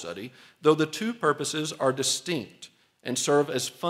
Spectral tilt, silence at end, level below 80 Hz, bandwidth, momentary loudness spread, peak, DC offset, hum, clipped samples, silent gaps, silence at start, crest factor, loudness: -3.5 dB/octave; 0 s; -76 dBFS; 16 kHz; 16 LU; -8 dBFS; under 0.1%; none; under 0.1%; none; 0 s; 20 dB; -26 LUFS